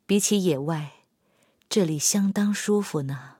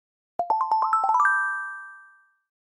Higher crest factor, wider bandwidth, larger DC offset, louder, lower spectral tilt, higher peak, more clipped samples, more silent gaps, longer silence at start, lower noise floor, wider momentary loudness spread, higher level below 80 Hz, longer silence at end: about the same, 16 dB vs 18 dB; first, 16.5 kHz vs 10 kHz; neither; about the same, -24 LUFS vs -23 LUFS; first, -4.5 dB/octave vs -1.5 dB/octave; about the same, -8 dBFS vs -8 dBFS; neither; neither; second, 0.1 s vs 0.4 s; first, -66 dBFS vs -55 dBFS; second, 9 LU vs 18 LU; first, -72 dBFS vs -80 dBFS; second, 0.1 s vs 0.7 s